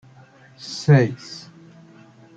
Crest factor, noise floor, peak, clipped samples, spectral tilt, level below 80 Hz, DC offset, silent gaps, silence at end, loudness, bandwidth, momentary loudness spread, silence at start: 20 dB; -49 dBFS; -2 dBFS; under 0.1%; -7 dB/octave; -62 dBFS; under 0.1%; none; 1 s; -19 LUFS; 7.8 kHz; 22 LU; 0.65 s